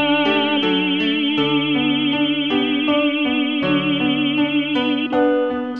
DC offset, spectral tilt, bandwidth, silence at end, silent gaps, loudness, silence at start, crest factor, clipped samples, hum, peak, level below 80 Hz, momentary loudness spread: 0.2%; -7 dB/octave; 5.2 kHz; 0 s; none; -18 LUFS; 0 s; 12 dB; under 0.1%; none; -6 dBFS; -56 dBFS; 2 LU